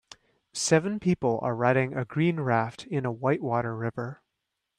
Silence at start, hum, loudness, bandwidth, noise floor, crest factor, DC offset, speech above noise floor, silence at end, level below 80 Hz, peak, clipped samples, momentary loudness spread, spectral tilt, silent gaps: 0.55 s; none; -27 LUFS; 13 kHz; -82 dBFS; 20 dB; under 0.1%; 56 dB; 0.65 s; -64 dBFS; -8 dBFS; under 0.1%; 8 LU; -5.5 dB/octave; none